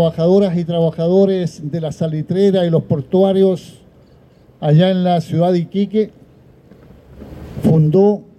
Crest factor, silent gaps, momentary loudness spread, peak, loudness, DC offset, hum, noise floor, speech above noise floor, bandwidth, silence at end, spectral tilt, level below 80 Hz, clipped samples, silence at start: 12 dB; none; 10 LU; -4 dBFS; -15 LUFS; under 0.1%; none; -47 dBFS; 33 dB; 9.8 kHz; 0.15 s; -8.5 dB/octave; -48 dBFS; under 0.1%; 0 s